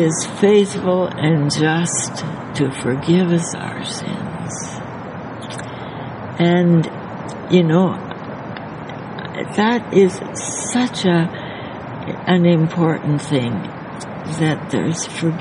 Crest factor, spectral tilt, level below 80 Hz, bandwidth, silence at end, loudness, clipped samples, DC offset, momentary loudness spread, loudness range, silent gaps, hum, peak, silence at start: 18 dB; -5.5 dB/octave; -54 dBFS; 11 kHz; 0 s; -18 LUFS; under 0.1%; under 0.1%; 15 LU; 4 LU; none; none; 0 dBFS; 0 s